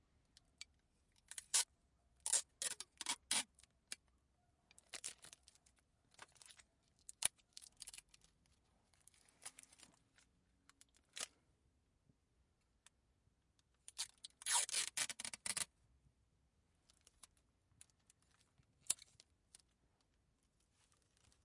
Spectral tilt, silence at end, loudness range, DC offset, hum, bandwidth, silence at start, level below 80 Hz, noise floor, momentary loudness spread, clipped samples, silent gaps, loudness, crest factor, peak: 2 dB/octave; 2.5 s; 17 LU; under 0.1%; none; 12 kHz; 1.3 s; -82 dBFS; -81 dBFS; 23 LU; under 0.1%; none; -42 LUFS; 36 dB; -14 dBFS